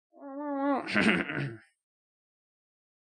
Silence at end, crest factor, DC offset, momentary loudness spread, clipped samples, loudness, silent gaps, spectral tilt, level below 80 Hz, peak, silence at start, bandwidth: 1.45 s; 24 dB; under 0.1%; 14 LU; under 0.1%; -30 LUFS; none; -5.5 dB/octave; -70 dBFS; -10 dBFS; 0.2 s; 11 kHz